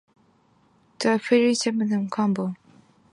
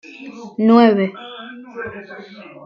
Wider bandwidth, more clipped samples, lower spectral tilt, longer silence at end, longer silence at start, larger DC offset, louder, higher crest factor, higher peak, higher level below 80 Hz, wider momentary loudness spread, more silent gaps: first, 11.5 kHz vs 6.4 kHz; neither; second, -5 dB/octave vs -8 dB/octave; first, 0.6 s vs 0.25 s; first, 1 s vs 0.2 s; neither; second, -23 LUFS vs -14 LUFS; about the same, 18 dB vs 18 dB; second, -8 dBFS vs -2 dBFS; second, -72 dBFS vs -64 dBFS; second, 9 LU vs 24 LU; neither